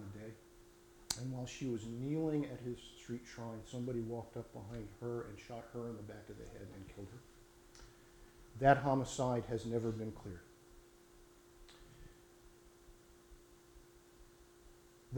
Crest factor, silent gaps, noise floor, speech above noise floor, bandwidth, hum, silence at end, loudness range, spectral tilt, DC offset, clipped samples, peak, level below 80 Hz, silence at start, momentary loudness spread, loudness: 28 dB; none; -63 dBFS; 23 dB; 19 kHz; none; 0 s; 24 LU; -6 dB/octave; under 0.1%; under 0.1%; -14 dBFS; -62 dBFS; 0 s; 26 LU; -41 LUFS